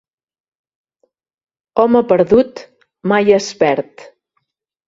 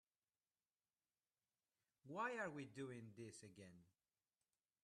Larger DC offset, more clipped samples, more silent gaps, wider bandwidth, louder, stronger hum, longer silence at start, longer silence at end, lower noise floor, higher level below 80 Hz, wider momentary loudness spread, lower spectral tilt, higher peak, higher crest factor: neither; neither; neither; second, 7.8 kHz vs 12 kHz; first, -14 LUFS vs -52 LUFS; neither; second, 1.75 s vs 2.05 s; second, 0.85 s vs 1 s; second, -70 dBFS vs under -90 dBFS; first, -52 dBFS vs under -90 dBFS; second, 13 LU vs 17 LU; about the same, -5.5 dB/octave vs -5 dB/octave; first, 0 dBFS vs -34 dBFS; about the same, 18 dB vs 22 dB